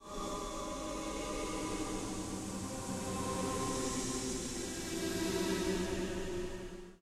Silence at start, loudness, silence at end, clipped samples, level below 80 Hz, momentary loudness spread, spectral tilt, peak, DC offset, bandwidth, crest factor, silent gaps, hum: 0 s; -38 LUFS; 0.05 s; under 0.1%; -50 dBFS; 6 LU; -4 dB/octave; -24 dBFS; under 0.1%; 16 kHz; 14 dB; none; none